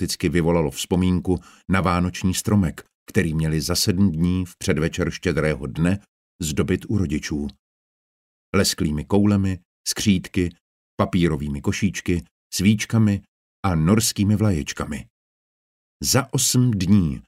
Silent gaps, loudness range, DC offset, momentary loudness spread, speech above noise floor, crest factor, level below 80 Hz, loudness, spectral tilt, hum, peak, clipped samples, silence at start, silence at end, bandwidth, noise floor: 2.94-3.06 s, 6.08-6.39 s, 7.59-8.53 s, 9.65-9.84 s, 10.61-10.98 s, 12.31-12.50 s, 13.28-13.63 s, 15.10-16.00 s; 3 LU; under 0.1%; 9 LU; over 69 dB; 18 dB; -40 dBFS; -22 LUFS; -5 dB/octave; none; -4 dBFS; under 0.1%; 0 s; 0.05 s; 16 kHz; under -90 dBFS